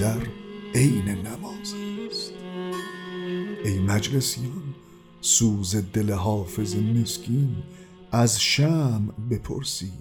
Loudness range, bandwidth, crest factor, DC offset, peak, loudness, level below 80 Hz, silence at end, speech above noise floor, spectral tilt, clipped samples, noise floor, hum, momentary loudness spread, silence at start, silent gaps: 5 LU; 19 kHz; 18 dB; under 0.1%; -6 dBFS; -25 LUFS; -50 dBFS; 0 s; 24 dB; -4.5 dB/octave; under 0.1%; -48 dBFS; none; 14 LU; 0 s; none